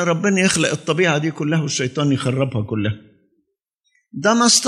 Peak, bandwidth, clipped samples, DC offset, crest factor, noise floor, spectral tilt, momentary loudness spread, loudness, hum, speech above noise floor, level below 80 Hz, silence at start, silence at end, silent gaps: -2 dBFS; 12.5 kHz; under 0.1%; under 0.1%; 16 dB; -71 dBFS; -4 dB/octave; 8 LU; -18 LUFS; none; 53 dB; -56 dBFS; 0 s; 0 s; 3.74-3.78 s